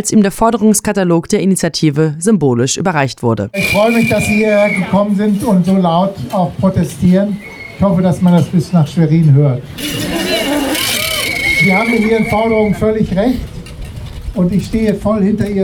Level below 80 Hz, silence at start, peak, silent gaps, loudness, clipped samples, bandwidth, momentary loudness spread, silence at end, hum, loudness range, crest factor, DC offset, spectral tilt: -34 dBFS; 0 s; 0 dBFS; none; -13 LUFS; under 0.1%; 19.5 kHz; 6 LU; 0 s; none; 1 LU; 12 dB; under 0.1%; -5.5 dB/octave